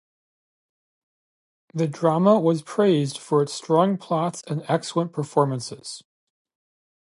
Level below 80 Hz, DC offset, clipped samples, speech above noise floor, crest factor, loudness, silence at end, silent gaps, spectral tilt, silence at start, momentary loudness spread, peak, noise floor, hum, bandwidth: -74 dBFS; under 0.1%; under 0.1%; over 68 dB; 20 dB; -22 LUFS; 1 s; none; -6.5 dB/octave; 1.75 s; 14 LU; -4 dBFS; under -90 dBFS; none; 11.5 kHz